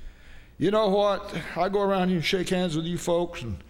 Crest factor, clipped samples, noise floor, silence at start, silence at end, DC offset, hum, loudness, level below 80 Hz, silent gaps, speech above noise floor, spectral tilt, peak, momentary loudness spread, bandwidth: 16 dB; under 0.1%; -47 dBFS; 0 s; 0 s; under 0.1%; none; -26 LUFS; -46 dBFS; none; 22 dB; -5.5 dB/octave; -10 dBFS; 6 LU; 16 kHz